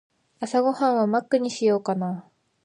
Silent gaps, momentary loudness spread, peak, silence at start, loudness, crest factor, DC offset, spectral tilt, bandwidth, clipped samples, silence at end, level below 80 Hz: none; 10 LU; -8 dBFS; 0.4 s; -23 LUFS; 16 dB; under 0.1%; -6 dB/octave; 10.5 kHz; under 0.1%; 0.45 s; -78 dBFS